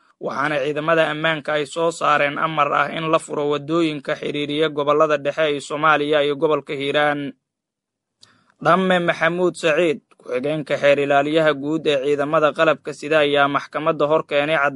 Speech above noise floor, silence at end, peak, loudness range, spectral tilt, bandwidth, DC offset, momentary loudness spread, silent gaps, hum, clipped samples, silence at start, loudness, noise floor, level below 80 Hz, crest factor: 64 dB; 0 s; -2 dBFS; 3 LU; -5 dB/octave; 11.5 kHz; under 0.1%; 7 LU; none; none; under 0.1%; 0.2 s; -19 LUFS; -83 dBFS; -66 dBFS; 18 dB